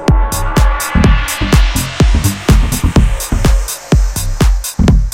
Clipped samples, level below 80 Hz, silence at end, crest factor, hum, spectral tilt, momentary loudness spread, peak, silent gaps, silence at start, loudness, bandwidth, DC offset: 0.1%; -12 dBFS; 0 s; 10 dB; none; -5 dB/octave; 3 LU; 0 dBFS; none; 0 s; -13 LUFS; 16.5 kHz; under 0.1%